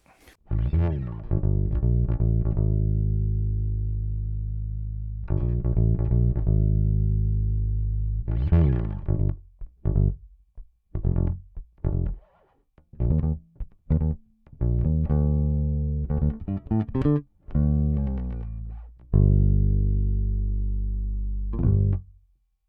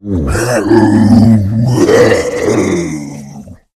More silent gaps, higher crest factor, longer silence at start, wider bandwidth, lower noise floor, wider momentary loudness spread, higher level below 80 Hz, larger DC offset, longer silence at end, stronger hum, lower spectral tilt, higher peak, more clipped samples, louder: neither; first, 16 dB vs 10 dB; first, 0.5 s vs 0.05 s; second, 3.2 kHz vs 14.5 kHz; first, -64 dBFS vs -31 dBFS; second, 10 LU vs 15 LU; about the same, -28 dBFS vs -30 dBFS; neither; first, 0.65 s vs 0.2 s; neither; first, -12.5 dB/octave vs -6.5 dB/octave; second, -8 dBFS vs 0 dBFS; second, under 0.1% vs 0.9%; second, -26 LUFS vs -10 LUFS